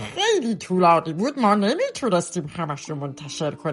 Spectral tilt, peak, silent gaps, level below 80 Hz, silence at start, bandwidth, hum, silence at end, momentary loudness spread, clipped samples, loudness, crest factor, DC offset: -5 dB/octave; -6 dBFS; none; -62 dBFS; 0 s; 11.5 kHz; none; 0 s; 12 LU; under 0.1%; -22 LUFS; 18 dB; under 0.1%